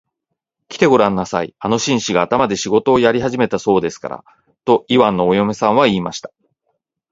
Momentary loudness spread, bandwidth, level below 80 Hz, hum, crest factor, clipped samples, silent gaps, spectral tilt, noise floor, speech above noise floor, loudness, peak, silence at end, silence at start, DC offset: 13 LU; 7.8 kHz; -50 dBFS; none; 16 dB; under 0.1%; none; -5 dB/octave; -78 dBFS; 62 dB; -16 LUFS; 0 dBFS; 0.85 s; 0.7 s; under 0.1%